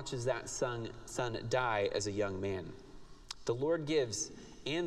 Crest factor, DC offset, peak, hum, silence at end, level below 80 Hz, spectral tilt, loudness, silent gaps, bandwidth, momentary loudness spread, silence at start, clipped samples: 18 dB; under 0.1%; -18 dBFS; none; 0 s; -58 dBFS; -4 dB/octave; -36 LUFS; none; 13 kHz; 10 LU; 0 s; under 0.1%